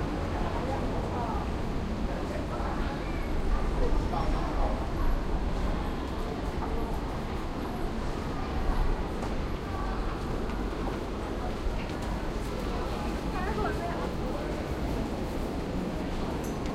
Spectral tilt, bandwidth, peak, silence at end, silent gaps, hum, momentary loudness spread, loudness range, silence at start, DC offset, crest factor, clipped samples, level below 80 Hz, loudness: -6.5 dB/octave; 14.5 kHz; -16 dBFS; 0 s; none; none; 3 LU; 2 LU; 0 s; under 0.1%; 14 dB; under 0.1%; -34 dBFS; -33 LUFS